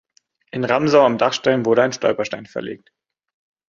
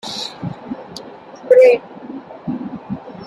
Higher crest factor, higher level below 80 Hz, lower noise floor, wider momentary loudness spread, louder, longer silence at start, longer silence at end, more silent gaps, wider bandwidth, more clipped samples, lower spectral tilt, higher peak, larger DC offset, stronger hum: about the same, 18 dB vs 16 dB; about the same, -62 dBFS vs -58 dBFS; first, -45 dBFS vs -36 dBFS; second, 16 LU vs 24 LU; about the same, -18 LUFS vs -16 LUFS; first, 0.55 s vs 0.05 s; first, 0.9 s vs 0 s; neither; second, 7.4 kHz vs 11.5 kHz; neither; about the same, -5 dB/octave vs -5.5 dB/octave; about the same, -2 dBFS vs -2 dBFS; neither; neither